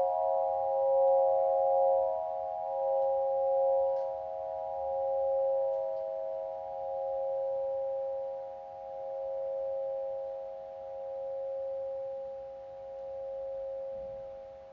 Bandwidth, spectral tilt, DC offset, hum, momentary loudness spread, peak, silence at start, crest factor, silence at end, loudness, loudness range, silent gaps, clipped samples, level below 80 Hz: 3.7 kHz; -4.5 dB/octave; under 0.1%; none; 15 LU; -18 dBFS; 0 s; 14 dB; 0 s; -33 LUFS; 10 LU; none; under 0.1%; -68 dBFS